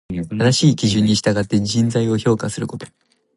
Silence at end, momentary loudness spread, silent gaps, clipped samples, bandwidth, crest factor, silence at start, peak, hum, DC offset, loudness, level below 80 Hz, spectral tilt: 0.5 s; 12 LU; none; under 0.1%; 11.5 kHz; 16 dB; 0.1 s; -2 dBFS; none; under 0.1%; -18 LUFS; -46 dBFS; -5.5 dB/octave